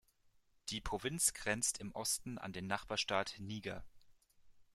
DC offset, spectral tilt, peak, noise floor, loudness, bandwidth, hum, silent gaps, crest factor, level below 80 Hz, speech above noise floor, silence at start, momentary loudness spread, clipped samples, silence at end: under 0.1%; -2 dB/octave; -18 dBFS; -72 dBFS; -39 LUFS; 16 kHz; none; none; 24 dB; -62 dBFS; 32 dB; 0.65 s; 11 LU; under 0.1%; 0.1 s